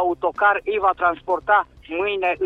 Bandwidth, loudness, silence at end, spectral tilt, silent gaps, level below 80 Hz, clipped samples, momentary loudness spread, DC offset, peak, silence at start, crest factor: 6 kHz; -20 LUFS; 0 s; -6 dB/octave; none; -52 dBFS; under 0.1%; 6 LU; under 0.1%; -6 dBFS; 0 s; 16 dB